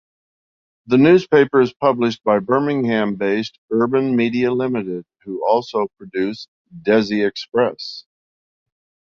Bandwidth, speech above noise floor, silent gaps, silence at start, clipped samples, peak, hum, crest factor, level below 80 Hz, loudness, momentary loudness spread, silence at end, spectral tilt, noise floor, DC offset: 7 kHz; over 72 dB; 3.58-3.68 s, 6.48-6.65 s; 0.9 s; under 0.1%; 0 dBFS; none; 18 dB; -60 dBFS; -18 LUFS; 15 LU; 1.1 s; -7 dB/octave; under -90 dBFS; under 0.1%